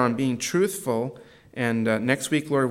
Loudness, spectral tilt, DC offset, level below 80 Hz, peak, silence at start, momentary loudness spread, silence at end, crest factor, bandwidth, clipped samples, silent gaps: -25 LUFS; -5 dB/octave; under 0.1%; -68 dBFS; -6 dBFS; 0 s; 6 LU; 0 s; 18 dB; 16.5 kHz; under 0.1%; none